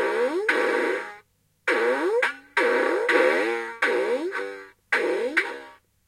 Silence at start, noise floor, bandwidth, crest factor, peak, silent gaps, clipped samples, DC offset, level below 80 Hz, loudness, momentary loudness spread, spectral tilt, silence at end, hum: 0 s; -58 dBFS; 14 kHz; 18 dB; -8 dBFS; none; under 0.1%; under 0.1%; -76 dBFS; -24 LUFS; 11 LU; -2.5 dB/octave; 0.35 s; none